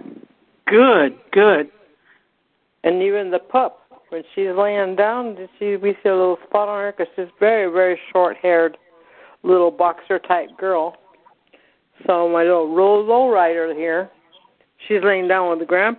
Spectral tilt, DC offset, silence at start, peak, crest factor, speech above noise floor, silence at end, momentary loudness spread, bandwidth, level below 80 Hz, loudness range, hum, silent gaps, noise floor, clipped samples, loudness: -10 dB/octave; under 0.1%; 0.05 s; -2 dBFS; 18 dB; 50 dB; 0.05 s; 11 LU; 4.3 kHz; -68 dBFS; 3 LU; none; none; -67 dBFS; under 0.1%; -18 LUFS